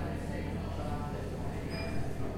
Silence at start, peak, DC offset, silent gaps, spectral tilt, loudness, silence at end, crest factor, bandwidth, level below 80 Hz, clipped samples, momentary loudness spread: 0 s; -22 dBFS; 0.3%; none; -7 dB/octave; -38 LUFS; 0 s; 12 dB; 16 kHz; -44 dBFS; under 0.1%; 1 LU